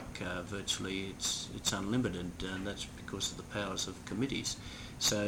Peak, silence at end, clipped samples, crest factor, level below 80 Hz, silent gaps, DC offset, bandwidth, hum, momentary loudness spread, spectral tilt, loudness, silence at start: -16 dBFS; 0 s; under 0.1%; 22 dB; -54 dBFS; none; under 0.1%; 18.5 kHz; none; 7 LU; -3 dB/octave; -36 LUFS; 0 s